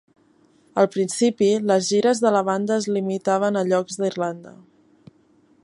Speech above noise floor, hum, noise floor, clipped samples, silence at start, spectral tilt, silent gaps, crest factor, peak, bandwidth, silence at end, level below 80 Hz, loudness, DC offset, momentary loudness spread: 38 dB; none; -58 dBFS; under 0.1%; 0.75 s; -5 dB/octave; none; 18 dB; -4 dBFS; 11.5 kHz; 1.15 s; -72 dBFS; -21 LUFS; under 0.1%; 8 LU